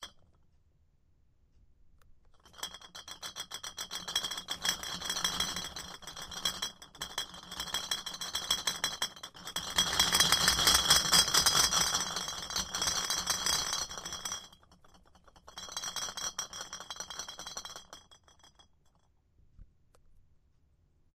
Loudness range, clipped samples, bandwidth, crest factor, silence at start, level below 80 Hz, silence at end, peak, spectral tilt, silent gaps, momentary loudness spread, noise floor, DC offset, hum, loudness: 20 LU; under 0.1%; 16 kHz; 26 dB; 0 s; -56 dBFS; 1.55 s; -8 dBFS; 0 dB/octave; none; 19 LU; -69 dBFS; under 0.1%; none; -30 LUFS